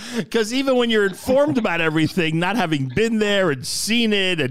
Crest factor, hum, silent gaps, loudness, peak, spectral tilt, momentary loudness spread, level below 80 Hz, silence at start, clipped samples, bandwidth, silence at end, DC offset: 12 dB; none; none; -19 LUFS; -8 dBFS; -4.5 dB/octave; 4 LU; -50 dBFS; 0 s; under 0.1%; 16 kHz; 0 s; 2%